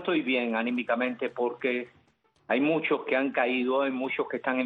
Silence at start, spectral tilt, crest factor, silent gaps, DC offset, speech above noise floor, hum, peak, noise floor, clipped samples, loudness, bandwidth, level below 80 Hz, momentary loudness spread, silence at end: 0 s; -7.5 dB/octave; 16 dB; none; under 0.1%; 39 dB; none; -12 dBFS; -67 dBFS; under 0.1%; -28 LUFS; 4.6 kHz; -76 dBFS; 5 LU; 0 s